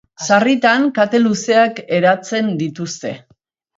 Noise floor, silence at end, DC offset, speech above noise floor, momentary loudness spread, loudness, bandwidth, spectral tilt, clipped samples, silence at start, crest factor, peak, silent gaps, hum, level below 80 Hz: -58 dBFS; 0.6 s; under 0.1%; 43 dB; 12 LU; -15 LUFS; 8 kHz; -4.5 dB/octave; under 0.1%; 0.2 s; 16 dB; 0 dBFS; none; none; -66 dBFS